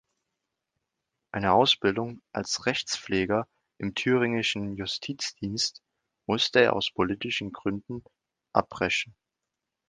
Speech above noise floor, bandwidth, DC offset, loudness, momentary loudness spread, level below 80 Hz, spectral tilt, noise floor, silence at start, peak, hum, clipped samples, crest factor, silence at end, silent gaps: 58 dB; 10 kHz; under 0.1%; -27 LUFS; 14 LU; -58 dBFS; -4 dB/octave; -86 dBFS; 1.35 s; -4 dBFS; none; under 0.1%; 24 dB; 0.8 s; none